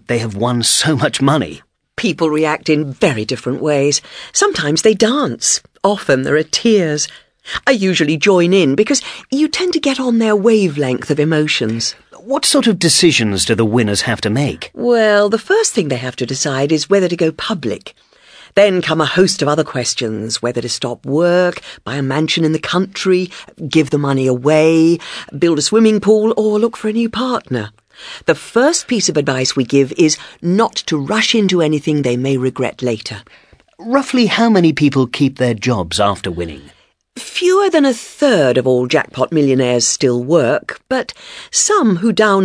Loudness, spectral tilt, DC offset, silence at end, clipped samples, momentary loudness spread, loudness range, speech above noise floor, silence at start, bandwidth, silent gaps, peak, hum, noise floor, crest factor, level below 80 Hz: -14 LUFS; -4 dB/octave; under 0.1%; 0 s; under 0.1%; 9 LU; 3 LU; 29 dB; 0.1 s; 11 kHz; none; 0 dBFS; none; -43 dBFS; 14 dB; -50 dBFS